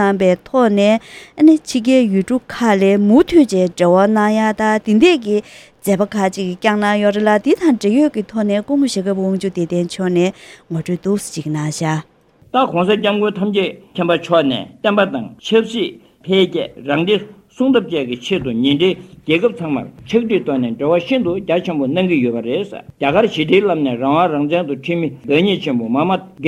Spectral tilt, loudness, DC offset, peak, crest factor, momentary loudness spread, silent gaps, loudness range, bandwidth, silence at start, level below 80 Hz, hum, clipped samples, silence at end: -6 dB/octave; -16 LUFS; under 0.1%; 0 dBFS; 16 dB; 8 LU; none; 5 LU; 14 kHz; 0 s; -52 dBFS; none; under 0.1%; 0 s